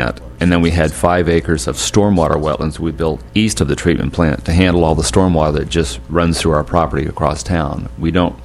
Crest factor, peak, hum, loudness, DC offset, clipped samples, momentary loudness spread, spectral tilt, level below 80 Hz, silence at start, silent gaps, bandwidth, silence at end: 14 dB; 0 dBFS; none; -15 LUFS; under 0.1%; under 0.1%; 6 LU; -5.5 dB/octave; -26 dBFS; 0 s; none; 14 kHz; 0 s